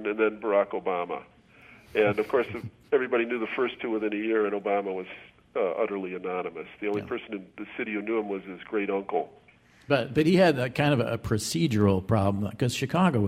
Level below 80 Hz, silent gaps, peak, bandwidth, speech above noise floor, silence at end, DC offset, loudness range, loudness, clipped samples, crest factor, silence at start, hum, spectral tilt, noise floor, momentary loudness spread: -58 dBFS; none; -8 dBFS; 15.5 kHz; 27 dB; 0 s; under 0.1%; 7 LU; -27 LUFS; under 0.1%; 20 dB; 0 s; none; -6 dB/octave; -54 dBFS; 12 LU